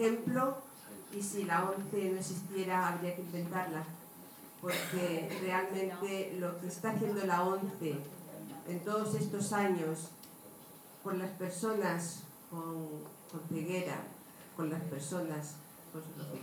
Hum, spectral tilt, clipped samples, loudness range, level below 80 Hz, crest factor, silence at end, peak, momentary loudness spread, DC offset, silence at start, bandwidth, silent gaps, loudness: none; -5 dB/octave; under 0.1%; 5 LU; -84 dBFS; 18 dB; 0 s; -18 dBFS; 16 LU; under 0.1%; 0 s; over 20 kHz; none; -37 LUFS